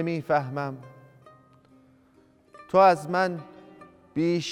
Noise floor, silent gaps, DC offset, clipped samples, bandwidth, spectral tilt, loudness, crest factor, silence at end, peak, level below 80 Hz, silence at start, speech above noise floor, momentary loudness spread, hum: -60 dBFS; none; under 0.1%; under 0.1%; 14 kHz; -6 dB/octave; -24 LUFS; 20 dB; 0 s; -6 dBFS; -68 dBFS; 0 s; 36 dB; 19 LU; none